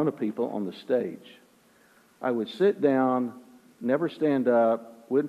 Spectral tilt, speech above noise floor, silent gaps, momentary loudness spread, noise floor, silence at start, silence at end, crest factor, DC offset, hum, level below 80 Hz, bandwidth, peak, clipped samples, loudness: -8 dB/octave; 34 dB; none; 12 LU; -60 dBFS; 0 s; 0 s; 16 dB; under 0.1%; none; -78 dBFS; 13.5 kHz; -10 dBFS; under 0.1%; -27 LUFS